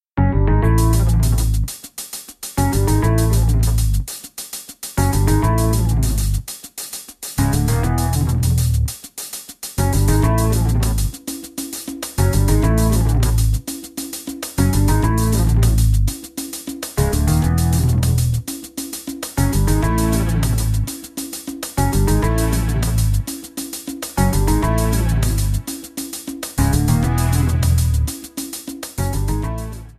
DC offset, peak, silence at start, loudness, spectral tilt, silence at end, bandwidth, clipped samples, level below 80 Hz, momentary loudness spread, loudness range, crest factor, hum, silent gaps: under 0.1%; -2 dBFS; 0.15 s; -19 LUFS; -5.5 dB/octave; 0.05 s; 14.5 kHz; under 0.1%; -22 dBFS; 12 LU; 2 LU; 16 dB; none; none